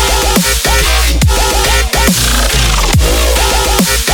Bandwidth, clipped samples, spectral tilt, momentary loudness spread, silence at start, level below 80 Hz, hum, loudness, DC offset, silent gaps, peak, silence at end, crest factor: over 20 kHz; under 0.1%; -3 dB/octave; 1 LU; 0 s; -14 dBFS; none; -10 LUFS; under 0.1%; none; 0 dBFS; 0 s; 10 dB